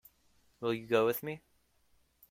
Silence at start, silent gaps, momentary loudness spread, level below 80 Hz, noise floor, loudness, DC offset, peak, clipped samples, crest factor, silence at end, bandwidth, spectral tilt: 0.6 s; none; 14 LU; -74 dBFS; -70 dBFS; -33 LUFS; under 0.1%; -16 dBFS; under 0.1%; 20 dB; 0.9 s; 16.5 kHz; -5.5 dB/octave